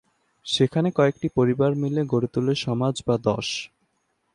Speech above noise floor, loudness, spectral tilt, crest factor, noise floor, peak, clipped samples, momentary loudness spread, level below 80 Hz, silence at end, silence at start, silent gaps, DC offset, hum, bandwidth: 49 dB; -23 LUFS; -6 dB/octave; 16 dB; -72 dBFS; -6 dBFS; under 0.1%; 7 LU; -56 dBFS; 0.7 s; 0.45 s; none; under 0.1%; none; 11 kHz